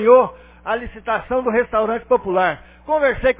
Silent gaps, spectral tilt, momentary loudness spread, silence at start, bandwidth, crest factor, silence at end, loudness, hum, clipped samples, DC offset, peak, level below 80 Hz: none; -9 dB/octave; 10 LU; 0 s; 3.9 kHz; 18 dB; 0.05 s; -19 LUFS; none; under 0.1%; under 0.1%; 0 dBFS; -42 dBFS